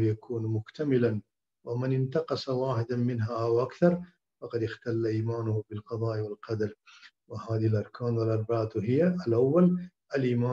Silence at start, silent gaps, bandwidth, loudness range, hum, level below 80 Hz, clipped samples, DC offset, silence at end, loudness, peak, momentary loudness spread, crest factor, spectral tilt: 0 s; none; 7.2 kHz; 5 LU; none; -68 dBFS; under 0.1%; under 0.1%; 0 s; -29 LUFS; -10 dBFS; 9 LU; 18 dB; -9 dB/octave